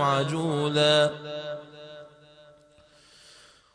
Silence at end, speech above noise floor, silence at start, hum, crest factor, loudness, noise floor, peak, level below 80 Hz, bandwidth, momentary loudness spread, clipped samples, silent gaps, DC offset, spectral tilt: 1.7 s; 33 dB; 0 s; none; 18 dB; -25 LUFS; -57 dBFS; -10 dBFS; -68 dBFS; 10.5 kHz; 24 LU; under 0.1%; none; under 0.1%; -5 dB/octave